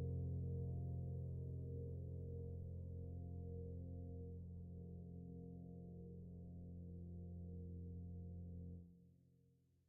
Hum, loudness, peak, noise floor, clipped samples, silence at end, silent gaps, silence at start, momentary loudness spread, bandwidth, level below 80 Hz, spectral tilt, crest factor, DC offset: none; -52 LUFS; -38 dBFS; -76 dBFS; under 0.1%; 0.55 s; none; 0 s; 9 LU; 1 kHz; -66 dBFS; -13 dB/octave; 14 dB; under 0.1%